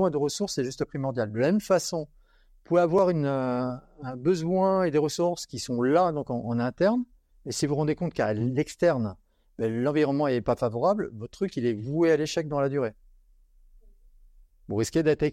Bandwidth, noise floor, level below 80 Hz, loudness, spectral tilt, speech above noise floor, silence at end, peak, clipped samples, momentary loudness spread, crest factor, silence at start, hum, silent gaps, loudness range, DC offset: 15.5 kHz; -58 dBFS; -56 dBFS; -27 LUFS; -6 dB/octave; 32 dB; 0 s; -10 dBFS; under 0.1%; 10 LU; 18 dB; 0 s; none; none; 3 LU; under 0.1%